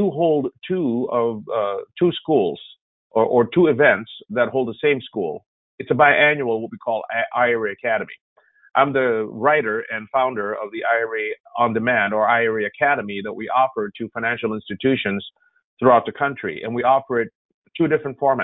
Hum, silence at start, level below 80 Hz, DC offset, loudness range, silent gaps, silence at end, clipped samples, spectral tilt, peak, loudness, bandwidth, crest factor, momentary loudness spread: none; 0 s; -62 dBFS; under 0.1%; 2 LU; 2.81-3.10 s, 5.46-5.78 s, 8.21-8.36 s, 11.40-11.44 s, 15.64-15.77 s, 17.35-17.62 s; 0 s; under 0.1%; -10.5 dB/octave; -2 dBFS; -20 LUFS; 4 kHz; 18 dB; 11 LU